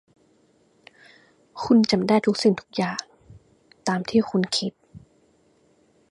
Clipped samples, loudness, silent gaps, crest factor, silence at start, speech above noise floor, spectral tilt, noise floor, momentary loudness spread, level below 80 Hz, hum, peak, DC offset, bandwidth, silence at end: under 0.1%; -23 LUFS; none; 20 dB; 1.55 s; 40 dB; -5 dB/octave; -62 dBFS; 14 LU; -62 dBFS; none; -6 dBFS; under 0.1%; 11.5 kHz; 1.15 s